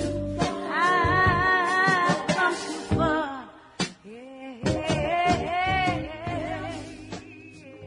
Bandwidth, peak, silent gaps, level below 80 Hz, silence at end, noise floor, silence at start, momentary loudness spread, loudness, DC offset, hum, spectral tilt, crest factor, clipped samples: 11 kHz; -8 dBFS; none; -46 dBFS; 0 s; -45 dBFS; 0 s; 20 LU; -24 LUFS; under 0.1%; none; -5 dB/octave; 18 dB; under 0.1%